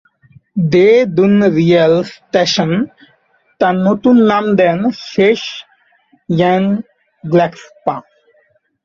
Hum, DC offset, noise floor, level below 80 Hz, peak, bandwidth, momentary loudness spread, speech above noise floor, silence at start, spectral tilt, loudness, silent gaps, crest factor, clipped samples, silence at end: none; under 0.1%; -56 dBFS; -54 dBFS; 0 dBFS; 7.4 kHz; 12 LU; 44 dB; 0.55 s; -6.5 dB/octave; -13 LUFS; none; 14 dB; under 0.1%; 0.85 s